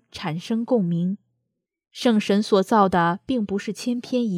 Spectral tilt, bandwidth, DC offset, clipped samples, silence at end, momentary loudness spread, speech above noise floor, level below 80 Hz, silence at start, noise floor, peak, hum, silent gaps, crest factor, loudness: -6.5 dB/octave; 14 kHz; under 0.1%; under 0.1%; 0 s; 10 LU; 58 dB; -58 dBFS; 0.15 s; -79 dBFS; -6 dBFS; none; none; 16 dB; -22 LUFS